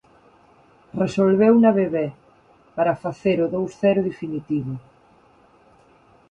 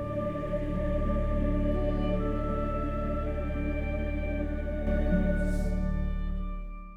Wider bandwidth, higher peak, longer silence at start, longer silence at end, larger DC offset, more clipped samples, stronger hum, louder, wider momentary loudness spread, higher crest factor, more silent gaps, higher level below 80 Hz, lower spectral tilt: first, 8.6 kHz vs 5 kHz; first, -4 dBFS vs -14 dBFS; first, 0.95 s vs 0 s; first, 1.5 s vs 0 s; neither; neither; neither; first, -21 LUFS vs -31 LUFS; first, 16 LU vs 5 LU; about the same, 18 dB vs 14 dB; neither; second, -60 dBFS vs -32 dBFS; about the same, -8 dB/octave vs -9 dB/octave